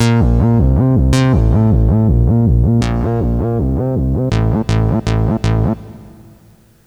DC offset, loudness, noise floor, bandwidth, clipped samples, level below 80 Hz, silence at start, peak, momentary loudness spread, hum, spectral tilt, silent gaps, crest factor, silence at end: under 0.1%; -14 LUFS; -46 dBFS; 11 kHz; under 0.1%; -20 dBFS; 0 s; 0 dBFS; 4 LU; none; -8 dB/octave; none; 12 dB; 0.75 s